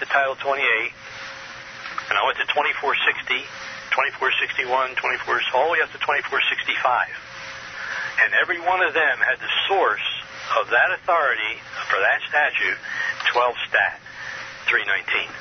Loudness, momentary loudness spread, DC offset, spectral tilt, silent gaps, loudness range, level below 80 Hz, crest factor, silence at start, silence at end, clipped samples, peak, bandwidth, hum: -21 LUFS; 13 LU; under 0.1%; -2 dB/octave; none; 2 LU; -62 dBFS; 18 dB; 0 s; 0 s; under 0.1%; -4 dBFS; 6.6 kHz; none